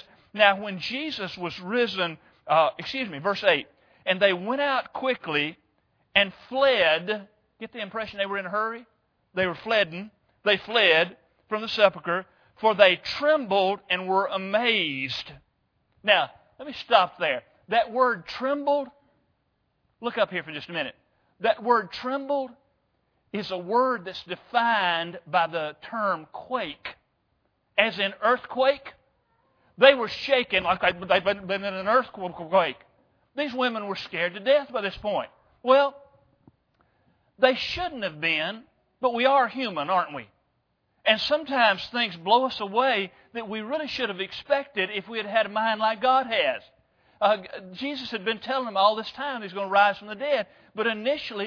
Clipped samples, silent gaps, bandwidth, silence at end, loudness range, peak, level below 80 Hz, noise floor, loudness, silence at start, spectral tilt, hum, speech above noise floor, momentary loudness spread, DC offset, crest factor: under 0.1%; none; 5.4 kHz; 0 s; 5 LU; -2 dBFS; -64 dBFS; -73 dBFS; -25 LUFS; 0.35 s; -5 dB/octave; none; 48 dB; 12 LU; under 0.1%; 24 dB